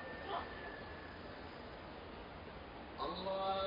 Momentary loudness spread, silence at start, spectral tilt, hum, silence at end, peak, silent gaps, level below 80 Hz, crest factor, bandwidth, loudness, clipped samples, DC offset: 10 LU; 0 s; -7 dB/octave; none; 0 s; -28 dBFS; none; -62 dBFS; 18 dB; 5.4 kHz; -46 LUFS; under 0.1%; under 0.1%